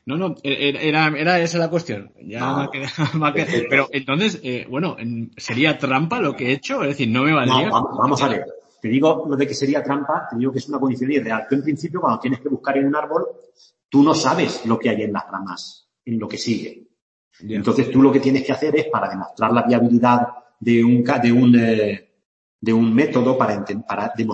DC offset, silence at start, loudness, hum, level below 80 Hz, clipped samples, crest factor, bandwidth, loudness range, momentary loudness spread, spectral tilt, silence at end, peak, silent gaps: under 0.1%; 0.05 s; -19 LUFS; none; -62 dBFS; under 0.1%; 18 dB; 8.4 kHz; 4 LU; 12 LU; -6 dB/octave; 0 s; -2 dBFS; 13.85-13.89 s, 17.02-17.31 s, 22.25-22.59 s